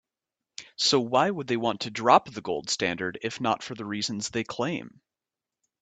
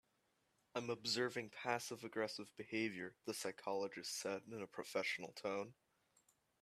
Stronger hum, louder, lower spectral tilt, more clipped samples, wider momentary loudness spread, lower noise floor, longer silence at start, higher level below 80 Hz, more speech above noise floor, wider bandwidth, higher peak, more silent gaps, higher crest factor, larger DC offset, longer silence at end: neither; first, -27 LUFS vs -44 LUFS; about the same, -3.5 dB/octave vs -3 dB/octave; neither; first, 12 LU vs 8 LU; first, -90 dBFS vs -82 dBFS; second, 0.6 s vs 0.75 s; first, -68 dBFS vs -88 dBFS; first, 63 dB vs 37 dB; second, 9.4 kHz vs 15 kHz; first, -4 dBFS vs -22 dBFS; neither; about the same, 24 dB vs 24 dB; neither; about the same, 0.9 s vs 0.9 s